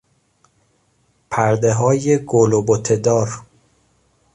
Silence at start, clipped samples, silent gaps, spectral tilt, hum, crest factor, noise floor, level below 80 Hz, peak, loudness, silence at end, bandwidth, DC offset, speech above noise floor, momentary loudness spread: 1.3 s; under 0.1%; none; -6 dB/octave; none; 16 dB; -62 dBFS; -52 dBFS; -2 dBFS; -17 LUFS; 0.9 s; 10.5 kHz; under 0.1%; 46 dB; 9 LU